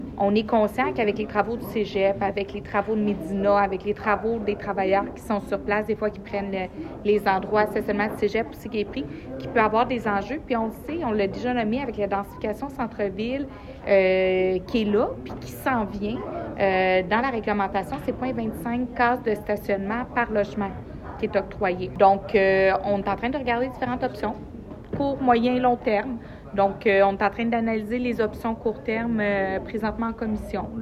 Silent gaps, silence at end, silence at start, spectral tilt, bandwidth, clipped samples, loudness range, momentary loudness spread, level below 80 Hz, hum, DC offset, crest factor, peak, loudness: none; 0 s; 0 s; -7 dB/octave; 15 kHz; under 0.1%; 3 LU; 10 LU; -46 dBFS; none; under 0.1%; 20 dB; -4 dBFS; -24 LUFS